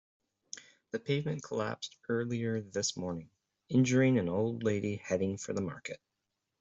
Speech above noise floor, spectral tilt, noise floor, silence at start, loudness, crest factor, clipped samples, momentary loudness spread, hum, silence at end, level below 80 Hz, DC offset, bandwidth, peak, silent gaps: 53 dB; -5.5 dB/octave; -86 dBFS; 0.55 s; -33 LUFS; 16 dB; under 0.1%; 17 LU; none; 0.65 s; -70 dBFS; under 0.1%; 8.2 kHz; -16 dBFS; none